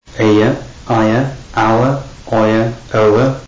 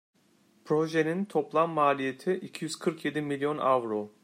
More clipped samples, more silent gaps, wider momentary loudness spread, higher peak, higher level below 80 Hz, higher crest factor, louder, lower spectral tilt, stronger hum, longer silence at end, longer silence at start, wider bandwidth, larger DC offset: neither; neither; about the same, 7 LU vs 7 LU; first, -4 dBFS vs -12 dBFS; first, -38 dBFS vs -78 dBFS; second, 10 dB vs 18 dB; first, -14 LUFS vs -29 LUFS; first, -7 dB/octave vs -5.5 dB/octave; neither; second, 0 s vs 0.15 s; second, 0.15 s vs 0.65 s; second, 7.8 kHz vs 16 kHz; first, 1% vs under 0.1%